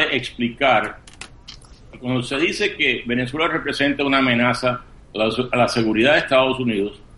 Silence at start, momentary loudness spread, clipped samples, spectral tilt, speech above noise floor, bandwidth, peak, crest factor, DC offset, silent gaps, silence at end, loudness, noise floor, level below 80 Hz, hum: 0 s; 14 LU; under 0.1%; -5 dB/octave; 23 dB; 11.5 kHz; -2 dBFS; 18 dB; under 0.1%; none; 0.2 s; -19 LUFS; -42 dBFS; -46 dBFS; none